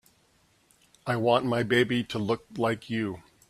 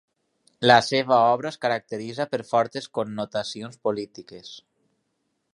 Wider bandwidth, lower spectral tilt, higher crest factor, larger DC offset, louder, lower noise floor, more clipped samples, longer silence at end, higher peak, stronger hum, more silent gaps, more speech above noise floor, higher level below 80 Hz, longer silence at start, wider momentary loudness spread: first, 14 kHz vs 11.5 kHz; first, -6 dB/octave vs -4.5 dB/octave; second, 18 dB vs 24 dB; neither; second, -27 LUFS vs -23 LUFS; second, -65 dBFS vs -75 dBFS; neither; second, 0.3 s vs 0.95 s; second, -10 dBFS vs -2 dBFS; neither; neither; second, 39 dB vs 52 dB; about the same, -64 dBFS vs -68 dBFS; first, 1.05 s vs 0.6 s; second, 8 LU vs 20 LU